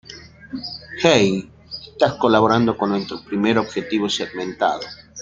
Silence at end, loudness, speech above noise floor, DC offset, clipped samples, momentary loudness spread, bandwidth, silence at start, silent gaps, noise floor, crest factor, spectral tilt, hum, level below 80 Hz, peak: 0 s; -19 LUFS; 22 dB; under 0.1%; under 0.1%; 19 LU; 9 kHz; 0.1 s; none; -41 dBFS; 18 dB; -5 dB/octave; none; -54 dBFS; -2 dBFS